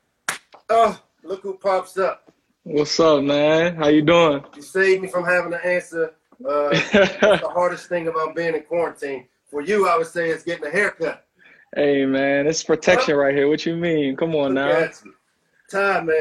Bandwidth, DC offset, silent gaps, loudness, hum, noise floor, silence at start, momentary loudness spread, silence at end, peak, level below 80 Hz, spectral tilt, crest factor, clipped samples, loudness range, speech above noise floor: 12.5 kHz; under 0.1%; none; -20 LUFS; none; -64 dBFS; 0.3 s; 13 LU; 0 s; -2 dBFS; -56 dBFS; -4.5 dB/octave; 18 dB; under 0.1%; 4 LU; 44 dB